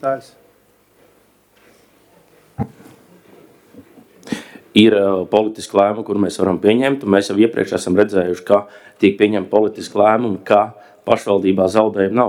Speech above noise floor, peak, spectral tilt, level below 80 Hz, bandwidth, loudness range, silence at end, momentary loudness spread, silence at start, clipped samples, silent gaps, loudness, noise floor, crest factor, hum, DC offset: 40 dB; 0 dBFS; -6 dB/octave; -56 dBFS; 15.5 kHz; 21 LU; 0 s; 15 LU; 0.05 s; under 0.1%; none; -16 LUFS; -55 dBFS; 18 dB; none; under 0.1%